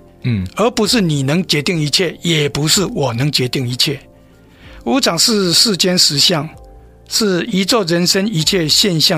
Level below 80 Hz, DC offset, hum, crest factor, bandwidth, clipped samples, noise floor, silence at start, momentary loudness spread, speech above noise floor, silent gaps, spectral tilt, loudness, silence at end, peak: -44 dBFS; under 0.1%; none; 16 dB; 16 kHz; under 0.1%; -44 dBFS; 0.25 s; 8 LU; 30 dB; none; -3.5 dB/octave; -14 LUFS; 0 s; 0 dBFS